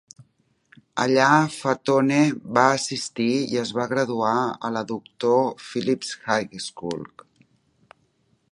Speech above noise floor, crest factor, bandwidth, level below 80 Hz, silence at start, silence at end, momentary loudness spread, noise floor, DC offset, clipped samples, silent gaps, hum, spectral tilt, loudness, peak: 44 dB; 22 dB; 11.5 kHz; -68 dBFS; 0.95 s; 1.5 s; 13 LU; -66 dBFS; under 0.1%; under 0.1%; none; none; -4.5 dB/octave; -23 LUFS; -2 dBFS